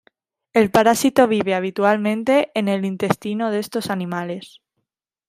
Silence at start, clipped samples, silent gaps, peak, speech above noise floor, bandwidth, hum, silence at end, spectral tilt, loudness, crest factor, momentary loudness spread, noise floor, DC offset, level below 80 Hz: 0.55 s; under 0.1%; none; 0 dBFS; 59 dB; 16 kHz; none; 0.8 s; -5 dB/octave; -19 LUFS; 20 dB; 9 LU; -78 dBFS; under 0.1%; -60 dBFS